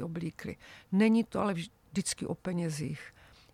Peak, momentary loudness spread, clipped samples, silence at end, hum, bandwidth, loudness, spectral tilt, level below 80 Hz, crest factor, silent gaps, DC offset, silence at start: -14 dBFS; 17 LU; under 0.1%; 0.45 s; none; 14 kHz; -32 LUFS; -5.5 dB/octave; -62 dBFS; 18 dB; none; under 0.1%; 0 s